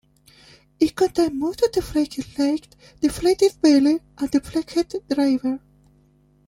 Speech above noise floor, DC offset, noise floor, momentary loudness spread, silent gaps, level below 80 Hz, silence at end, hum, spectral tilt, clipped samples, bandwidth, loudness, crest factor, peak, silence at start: 37 dB; under 0.1%; -58 dBFS; 8 LU; none; -48 dBFS; 0.9 s; none; -5 dB/octave; under 0.1%; 16 kHz; -21 LUFS; 16 dB; -4 dBFS; 0.8 s